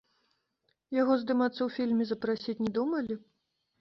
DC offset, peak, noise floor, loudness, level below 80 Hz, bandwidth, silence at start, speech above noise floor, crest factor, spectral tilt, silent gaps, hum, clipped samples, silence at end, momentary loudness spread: under 0.1%; -16 dBFS; -78 dBFS; -30 LUFS; -72 dBFS; 6.2 kHz; 0.9 s; 48 dB; 16 dB; -7.5 dB/octave; none; none; under 0.1%; 0.6 s; 7 LU